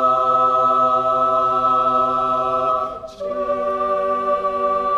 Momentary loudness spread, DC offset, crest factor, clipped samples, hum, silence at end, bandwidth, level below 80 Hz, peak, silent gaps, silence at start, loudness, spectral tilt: 7 LU; under 0.1%; 12 dB; under 0.1%; none; 0 s; 9.8 kHz; -52 dBFS; -8 dBFS; none; 0 s; -18 LUFS; -6 dB/octave